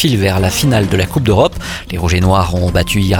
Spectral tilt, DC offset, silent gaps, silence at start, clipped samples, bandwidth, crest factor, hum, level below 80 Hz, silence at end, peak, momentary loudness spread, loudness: -5.5 dB/octave; under 0.1%; none; 0 s; under 0.1%; 19 kHz; 12 dB; none; -26 dBFS; 0 s; 0 dBFS; 5 LU; -13 LUFS